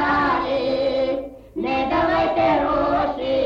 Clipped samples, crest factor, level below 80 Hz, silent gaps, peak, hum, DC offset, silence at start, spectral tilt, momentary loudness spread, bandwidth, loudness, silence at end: under 0.1%; 10 dB; -42 dBFS; none; -10 dBFS; none; under 0.1%; 0 s; -7 dB/octave; 6 LU; 7.2 kHz; -21 LUFS; 0 s